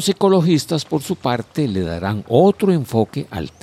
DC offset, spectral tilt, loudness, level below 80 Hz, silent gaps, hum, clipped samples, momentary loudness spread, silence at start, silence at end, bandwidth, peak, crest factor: under 0.1%; -6.5 dB/octave; -18 LUFS; -46 dBFS; none; none; under 0.1%; 9 LU; 0 s; 0.15 s; 15 kHz; -2 dBFS; 16 dB